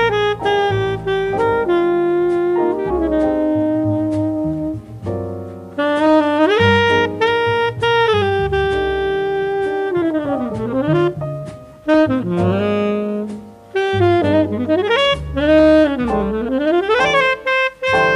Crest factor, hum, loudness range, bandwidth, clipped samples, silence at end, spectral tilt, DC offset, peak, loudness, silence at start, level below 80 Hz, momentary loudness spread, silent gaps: 16 dB; none; 4 LU; 11.5 kHz; under 0.1%; 0 s; -6.5 dB/octave; under 0.1%; 0 dBFS; -16 LUFS; 0 s; -38 dBFS; 10 LU; none